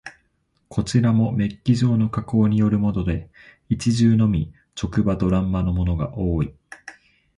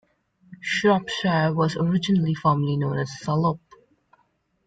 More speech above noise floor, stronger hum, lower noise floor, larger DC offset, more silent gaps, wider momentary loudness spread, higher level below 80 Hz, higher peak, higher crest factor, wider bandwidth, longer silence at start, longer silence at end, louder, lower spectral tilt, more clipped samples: about the same, 47 dB vs 46 dB; neither; about the same, -68 dBFS vs -68 dBFS; neither; neither; first, 12 LU vs 6 LU; first, -36 dBFS vs -60 dBFS; about the same, -6 dBFS vs -8 dBFS; about the same, 16 dB vs 16 dB; first, 11 kHz vs 9 kHz; second, 0.05 s vs 0.5 s; second, 0.45 s vs 1.1 s; about the same, -21 LUFS vs -23 LUFS; about the same, -7.5 dB/octave vs -6.5 dB/octave; neither